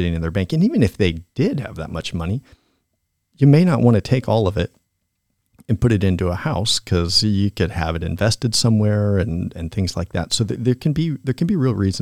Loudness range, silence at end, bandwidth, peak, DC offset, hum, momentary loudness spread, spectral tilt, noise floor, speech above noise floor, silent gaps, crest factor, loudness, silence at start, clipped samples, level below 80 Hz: 2 LU; 0 s; 15 kHz; -2 dBFS; 0.3%; none; 9 LU; -6 dB/octave; -72 dBFS; 54 dB; none; 18 dB; -19 LUFS; 0 s; under 0.1%; -42 dBFS